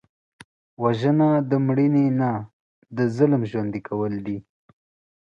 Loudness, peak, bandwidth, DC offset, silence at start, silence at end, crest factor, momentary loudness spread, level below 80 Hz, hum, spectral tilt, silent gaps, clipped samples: -22 LUFS; -6 dBFS; 7.4 kHz; under 0.1%; 0.8 s; 0.8 s; 18 dB; 13 LU; -62 dBFS; none; -9.5 dB/octave; 2.53-2.82 s; under 0.1%